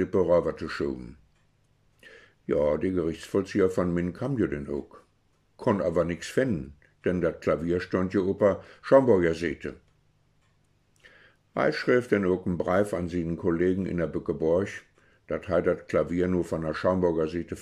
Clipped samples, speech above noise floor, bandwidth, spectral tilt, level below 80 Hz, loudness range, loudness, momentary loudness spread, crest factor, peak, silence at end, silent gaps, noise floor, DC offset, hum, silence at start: under 0.1%; 41 dB; 12.5 kHz; -7.5 dB/octave; -52 dBFS; 4 LU; -27 LUFS; 11 LU; 20 dB; -6 dBFS; 0 s; none; -67 dBFS; under 0.1%; none; 0 s